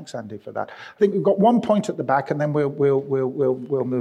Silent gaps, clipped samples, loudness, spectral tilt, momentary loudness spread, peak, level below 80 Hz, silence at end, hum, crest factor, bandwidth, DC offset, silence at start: none; under 0.1%; -21 LUFS; -7.5 dB/octave; 14 LU; -6 dBFS; -68 dBFS; 0 s; none; 16 dB; 9.6 kHz; under 0.1%; 0 s